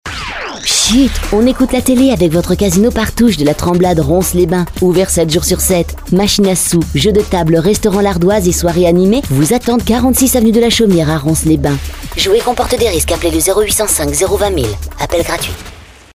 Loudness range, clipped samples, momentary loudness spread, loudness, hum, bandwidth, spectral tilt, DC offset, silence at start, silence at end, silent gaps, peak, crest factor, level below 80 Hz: 2 LU; under 0.1%; 6 LU; -11 LUFS; none; 16 kHz; -4.5 dB/octave; under 0.1%; 0.05 s; 0.3 s; none; 0 dBFS; 10 dB; -26 dBFS